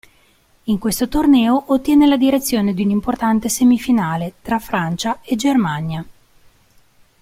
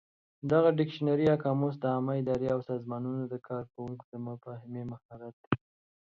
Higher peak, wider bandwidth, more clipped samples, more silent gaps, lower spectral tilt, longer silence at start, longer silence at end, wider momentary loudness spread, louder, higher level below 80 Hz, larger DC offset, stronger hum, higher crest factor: first, -4 dBFS vs -10 dBFS; first, 16.5 kHz vs 7.2 kHz; neither; second, none vs 4.04-4.12 s, 5.05-5.09 s, 5.33-5.51 s; second, -5 dB/octave vs -9.5 dB/octave; first, 0.65 s vs 0.45 s; first, 1.1 s vs 0.5 s; second, 10 LU vs 16 LU; first, -17 LUFS vs -31 LUFS; first, -42 dBFS vs -66 dBFS; neither; neither; second, 14 dB vs 22 dB